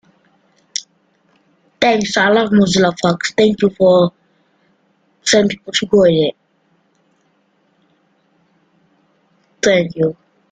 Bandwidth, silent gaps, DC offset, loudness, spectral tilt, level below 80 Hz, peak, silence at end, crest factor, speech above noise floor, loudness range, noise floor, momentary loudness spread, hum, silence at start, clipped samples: 9.4 kHz; none; under 0.1%; -14 LUFS; -4.5 dB/octave; -54 dBFS; 0 dBFS; 0.4 s; 16 dB; 47 dB; 8 LU; -60 dBFS; 9 LU; none; 0.75 s; under 0.1%